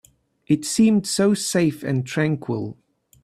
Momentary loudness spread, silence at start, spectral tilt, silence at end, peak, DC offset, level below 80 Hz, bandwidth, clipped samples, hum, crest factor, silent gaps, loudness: 10 LU; 0.5 s; -5 dB/octave; 0.5 s; -6 dBFS; under 0.1%; -60 dBFS; 14.5 kHz; under 0.1%; none; 16 dB; none; -21 LUFS